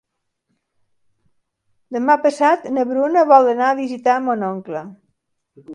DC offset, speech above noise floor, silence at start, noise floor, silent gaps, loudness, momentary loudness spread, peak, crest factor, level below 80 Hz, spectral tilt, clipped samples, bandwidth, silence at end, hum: under 0.1%; 56 dB; 1.9 s; -73 dBFS; none; -16 LUFS; 15 LU; 0 dBFS; 18 dB; -72 dBFS; -5.5 dB/octave; under 0.1%; 10.5 kHz; 0 s; none